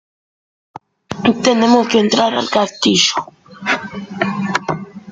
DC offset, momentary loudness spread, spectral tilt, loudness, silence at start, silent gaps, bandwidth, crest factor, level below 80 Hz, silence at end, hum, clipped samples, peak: under 0.1%; 13 LU; -3.5 dB/octave; -15 LUFS; 1.1 s; none; 9.4 kHz; 16 dB; -56 dBFS; 0 s; none; under 0.1%; 0 dBFS